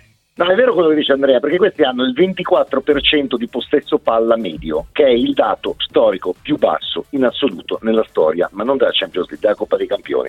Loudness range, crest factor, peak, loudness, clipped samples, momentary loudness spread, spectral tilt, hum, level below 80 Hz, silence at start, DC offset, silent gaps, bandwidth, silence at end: 3 LU; 16 dB; 0 dBFS; -16 LUFS; under 0.1%; 7 LU; -6.5 dB/octave; none; -46 dBFS; 0.4 s; under 0.1%; none; 4.9 kHz; 0 s